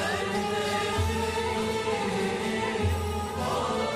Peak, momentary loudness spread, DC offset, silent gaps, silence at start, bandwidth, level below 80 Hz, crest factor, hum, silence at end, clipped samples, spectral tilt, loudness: -16 dBFS; 2 LU; under 0.1%; none; 0 s; 14 kHz; -42 dBFS; 12 dB; none; 0 s; under 0.1%; -4.5 dB/octave; -28 LUFS